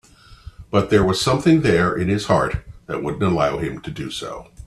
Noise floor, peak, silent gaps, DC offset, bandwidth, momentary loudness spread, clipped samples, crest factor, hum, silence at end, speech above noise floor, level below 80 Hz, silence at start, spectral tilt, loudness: -42 dBFS; -2 dBFS; none; under 0.1%; 13.5 kHz; 14 LU; under 0.1%; 18 dB; none; 0 s; 23 dB; -40 dBFS; 0.3 s; -6 dB/octave; -20 LUFS